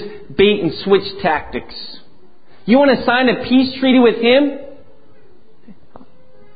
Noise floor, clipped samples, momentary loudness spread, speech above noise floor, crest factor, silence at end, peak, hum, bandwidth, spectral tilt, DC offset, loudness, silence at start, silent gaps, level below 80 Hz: -51 dBFS; under 0.1%; 18 LU; 37 dB; 16 dB; 1.85 s; 0 dBFS; none; 5 kHz; -10 dB/octave; 2%; -14 LUFS; 0 s; none; -48 dBFS